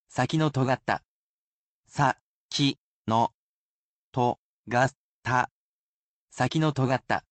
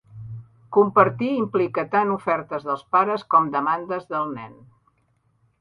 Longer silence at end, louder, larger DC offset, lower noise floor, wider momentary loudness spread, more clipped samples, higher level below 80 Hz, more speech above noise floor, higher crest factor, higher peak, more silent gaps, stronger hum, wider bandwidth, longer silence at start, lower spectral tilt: second, 0.1 s vs 1.1 s; second, -27 LUFS vs -22 LUFS; neither; first, under -90 dBFS vs -66 dBFS; second, 10 LU vs 19 LU; neither; about the same, -62 dBFS vs -64 dBFS; first, over 64 dB vs 44 dB; about the same, 20 dB vs 22 dB; second, -10 dBFS vs -2 dBFS; first, 1.05-1.83 s, 2.21-2.49 s, 2.78-3.05 s, 3.34-4.12 s, 4.38-4.64 s, 4.95-5.23 s, 5.51-6.28 s vs none; neither; first, 9 kHz vs 5.2 kHz; about the same, 0.15 s vs 0.15 s; second, -5.5 dB/octave vs -8.5 dB/octave